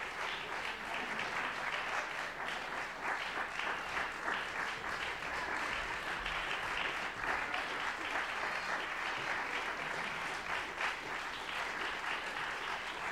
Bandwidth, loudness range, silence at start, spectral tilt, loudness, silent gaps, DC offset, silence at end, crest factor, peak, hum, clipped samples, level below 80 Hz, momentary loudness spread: 16 kHz; 1 LU; 0 s; -2 dB/octave; -37 LUFS; none; under 0.1%; 0 s; 16 dB; -22 dBFS; none; under 0.1%; -62 dBFS; 3 LU